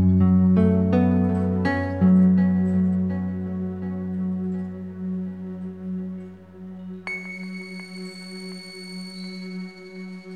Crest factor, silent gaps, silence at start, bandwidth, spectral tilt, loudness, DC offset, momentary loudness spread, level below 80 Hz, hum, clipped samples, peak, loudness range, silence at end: 16 dB; none; 0 s; 9.4 kHz; -8.5 dB/octave; -23 LUFS; 0.1%; 19 LU; -52 dBFS; none; under 0.1%; -8 dBFS; 15 LU; 0 s